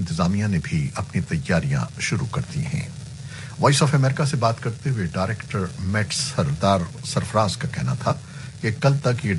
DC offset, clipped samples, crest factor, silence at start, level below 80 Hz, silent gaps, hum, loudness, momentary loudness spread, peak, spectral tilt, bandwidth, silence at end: under 0.1%; under 0.1%; 18 dB; 0 s; -46 dBFS; none; none; -23 LUFS; 8 LU; -4 dBFS; -5.5 dB/octave; 11.5 kHz; 0 s